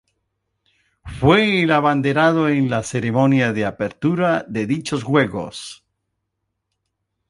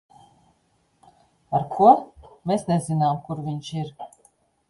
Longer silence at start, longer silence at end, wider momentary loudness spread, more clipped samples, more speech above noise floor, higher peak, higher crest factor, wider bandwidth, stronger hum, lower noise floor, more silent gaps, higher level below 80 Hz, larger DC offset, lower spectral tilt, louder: second, 1.05 s vs 1.5 s; first, 1.55 s vs 0.65 s; second, 10 LU vs 20 LU; neither; first, 58 dB vs 45 dB; about the same, -2 dBFS vs -2 dBFS; about the same, 18 dB vs 22 dB; about the same, 11.5 kHz vs 11.5 kHz; neither; first, -76 dBFS vs -66 dBFS; neither; first, -48 dBFS vs -60 dBFS; neither; second, -6 dB/octave vs -7.5 dB/octave; first, -18 LUFS vs -22 LUFS